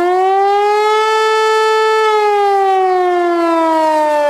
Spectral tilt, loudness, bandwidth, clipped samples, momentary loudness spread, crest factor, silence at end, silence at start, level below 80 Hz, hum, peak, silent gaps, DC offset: -2 dB/octave; -12 LUFS; 14 kHz; under 0.1%; 1 LU; 10 dB; 0 s; 0 s; -58 dBFS; none; -2 dBFS; none; under 0.1%